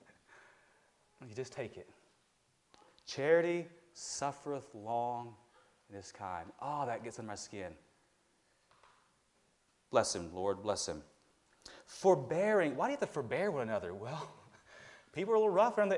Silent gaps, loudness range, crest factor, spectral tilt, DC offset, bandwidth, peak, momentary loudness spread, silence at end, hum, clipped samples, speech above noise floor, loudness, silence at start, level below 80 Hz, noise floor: none; 10 LU; 22 dB; -4.5 dB/octave; under 0.1%; 11.5 kHz; -16 dBFS; 21 LU; 0 s; none; under 0.1%; 39 dB; -36 LUFS; 1.2 s; -76 dBFS; -75 dBFS